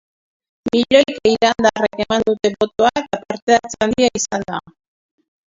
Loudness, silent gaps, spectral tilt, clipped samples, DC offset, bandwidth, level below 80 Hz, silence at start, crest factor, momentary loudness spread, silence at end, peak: -17 LUFS; 3.42-3.47 s; -3.5 dB/octave; under 0.1%; under 0.1%; 7.8 kHz; -50 dBFS; 0.65 s; 18 dB; 10 LU; 0.9 s; 0 dBFS